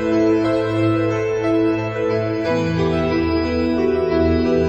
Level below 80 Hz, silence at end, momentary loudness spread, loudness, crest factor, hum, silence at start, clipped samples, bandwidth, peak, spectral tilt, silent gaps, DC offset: -36 dBFS; 0 s; 3 LU; -19 LUFS; 12 dB; none; 0 s; under 0.1%; 8.2 kHz; -6 dBFS; -7.5 dB/octave; none; under 0.1%